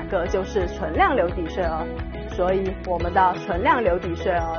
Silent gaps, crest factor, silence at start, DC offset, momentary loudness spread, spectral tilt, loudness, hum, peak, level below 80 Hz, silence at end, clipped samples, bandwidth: none; 16 dB; 0 s; under 0.1%; 7 LU; -5 dB/octave; -23 LUFS; none; -6 dBFS; -34 dBFS; 0 s; under 0.1%; 6.8 kHz